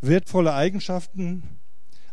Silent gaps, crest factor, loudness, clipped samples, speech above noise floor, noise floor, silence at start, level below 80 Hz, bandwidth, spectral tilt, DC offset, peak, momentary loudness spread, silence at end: none; 18 dB; -24 LUFS; under 0.1%; 38 dB; -61 dBFS; 0 s; -58 dBFS; 11.5 kHz; -7 dB/octave; 4%; -6 dBFS; 11 LU; 0.55 s